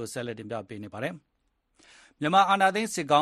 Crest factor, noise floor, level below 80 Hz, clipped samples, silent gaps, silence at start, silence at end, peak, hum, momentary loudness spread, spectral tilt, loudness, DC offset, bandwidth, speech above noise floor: 20 dB; -74 dBFS; -70 dBFS; under 0.1%; none; 0 s; 0 s; -8 dBFS; none; 15 LU; -4 dB/octave; -26 LUFS; under 0.1%; 13 kHz; 48 dB